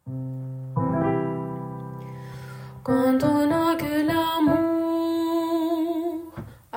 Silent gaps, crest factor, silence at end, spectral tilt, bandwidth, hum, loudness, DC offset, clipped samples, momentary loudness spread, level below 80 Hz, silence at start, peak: none; 14 dB; 0 s; -7 dB/octave; 16.5 kHz; none; -24 LUFS; under 0.1%; under 0.1%; 17 LU; -56 dBFS; 0.05 s; -10 dBFS